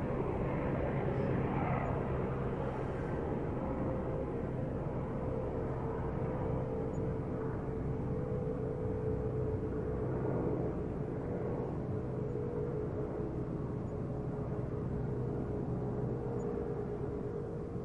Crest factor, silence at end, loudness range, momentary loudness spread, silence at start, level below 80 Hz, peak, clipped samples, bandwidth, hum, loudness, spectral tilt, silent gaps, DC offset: 16 dB; 0 s; 2 LU; 4 LU; 0 s; -48 dBFS; -20 dBFS; under 0.1%; 7.4 kHz; none; -37 LUFS; -10 dB/octave; none; under 0.1%